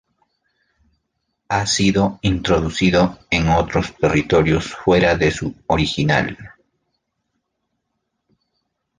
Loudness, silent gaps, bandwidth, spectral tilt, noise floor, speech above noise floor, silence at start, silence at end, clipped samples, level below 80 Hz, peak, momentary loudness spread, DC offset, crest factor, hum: -18 LUFS; none; 10 kHz; -5 dB/octave; -75 dBFS; 57 dB; 1.5 s; 2.5 s; under 0.1%; -36 dBFS; -2 dBFS; 6 LU; under 0.1%; 18 dB; none